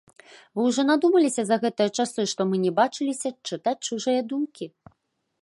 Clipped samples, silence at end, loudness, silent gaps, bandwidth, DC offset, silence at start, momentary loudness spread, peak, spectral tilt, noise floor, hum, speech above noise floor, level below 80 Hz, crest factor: under 0.1%; 0.75 s; -24 LUFS; none; 11.5 kHz; under 0.1%; 0.55 s; 10 LU; -6 dBFS; -4.5 dB/octave; -74 dBFS; none; 50 dB; -74 dBFS; 18 dB